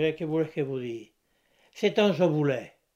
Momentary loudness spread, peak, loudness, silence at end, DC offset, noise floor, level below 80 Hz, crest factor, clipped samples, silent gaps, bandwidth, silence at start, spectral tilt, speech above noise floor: 11 LU; -10 dBFS; -27 LUFS; 0.3 s; under 0.1%; -69 dBFS; -70 dBFS; 18 dB; under 0.1%; none; 14.5 kHz; 0 s; -7 dB/octave; 43 dB